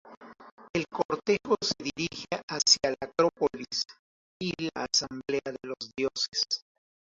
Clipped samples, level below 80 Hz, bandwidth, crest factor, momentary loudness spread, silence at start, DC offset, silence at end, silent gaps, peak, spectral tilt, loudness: under 0.1%; -64 dBFS; 8 kHz; 24 dB; 12 LU; 0.05 s; under 0.1%; 0.6 s; 0.17-0.21 s, 0.51-0.57 s, 0.70-0.74 s, 1.05-1.09 s, 2.43-2.48 s, 3.99-4.40 s, 6.28-6.32 s; -6 dBFS; -2.5 dB/octave; -29 LUFS